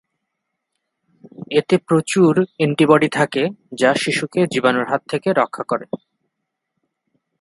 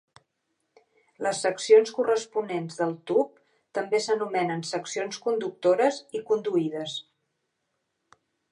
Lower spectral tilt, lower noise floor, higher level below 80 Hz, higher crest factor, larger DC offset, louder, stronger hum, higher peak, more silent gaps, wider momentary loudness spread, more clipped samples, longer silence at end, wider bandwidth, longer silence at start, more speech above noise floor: first, -5.5 dB/octave vs -4 dB/octave; about the same, -78 dBFS vs -79 dBFS; first, -64 dBFS vs -82 dBFS; about the same, 20 dB vs 20 dB; neither; first, -18 LUFS vs -26 LUFS; neither; first, 0 dBFS vs -6 dBFS; neither; second, 10 LU vs 14 LU; neither; about the same, 1.45 s vs 1.5 s; about the same, 11.5 kHz vs 11 kHz; first, 1.4 s vs 1.2 s; first, 60 dB vs 53 dB